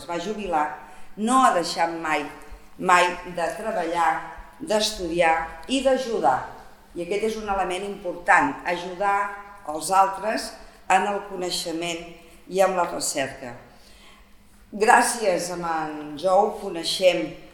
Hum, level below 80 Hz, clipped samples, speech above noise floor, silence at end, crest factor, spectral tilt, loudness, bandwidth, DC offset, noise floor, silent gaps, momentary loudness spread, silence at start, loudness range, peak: none; -52 dBFS; under 0.1%; 27 dB; 0.05 s; 24 dB; -3 dB/octave; -23 LUFS; 19 kHz; under 0.1%; -51 dBFS; none; 14 LU; 0 s; 3 LU; 0 dBFS